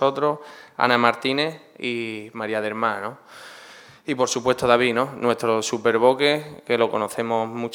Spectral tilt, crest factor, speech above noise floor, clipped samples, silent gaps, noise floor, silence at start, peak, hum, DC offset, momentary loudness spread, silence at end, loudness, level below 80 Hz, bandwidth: -4 dB/octave; 22 dB; 23 dB; under 0.1%; none; -46 dBFS; 0 s; 0 dBFS; none; under 0.1%; 16 LU; 0 s; -22 LUFS; -64 dBFS; 17.5 kHz